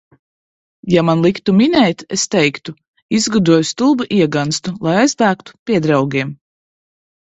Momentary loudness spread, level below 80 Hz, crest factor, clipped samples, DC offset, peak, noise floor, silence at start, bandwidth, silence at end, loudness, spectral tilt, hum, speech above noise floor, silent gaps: 8 LU; -52 dBFS; 16 dB; under 0.1%; under 0.1%; 0 dBFS; under -90 dBFS; 0.85 s; 8.4 kHz; 1.05 s; -15 LUFS; -5 dB/octave; none; over 76 dB; 2.88-2.94 s, 3.02-3.09 s, 5.59-5.66 s